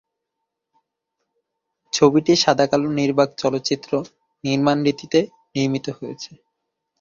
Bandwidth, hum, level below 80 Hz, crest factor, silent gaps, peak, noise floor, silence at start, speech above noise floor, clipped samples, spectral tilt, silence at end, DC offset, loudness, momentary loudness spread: 7.6 kHz; 50 Hz at -65 dBFS; -60 dBFS; 20 dB; none; -2 dBFS; -80 dBFS; 1.95 s; 61 dB; under 0.1%; -5 dB/octave; 0.75 s; under 0.1%; -20 LUFS; 15 LU